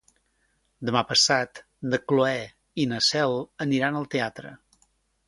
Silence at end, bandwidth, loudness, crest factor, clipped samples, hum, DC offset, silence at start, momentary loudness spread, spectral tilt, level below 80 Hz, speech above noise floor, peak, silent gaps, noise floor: 0.7 s; 11.5 kHz; -24 LUFS; 22 dB; under 0.1%; none; under 0.1%; 0.8 s; 15 LU; -3.5 dB/octave; -64 dBFS; 45 dB; -6 dBFS; none; -70 dBFS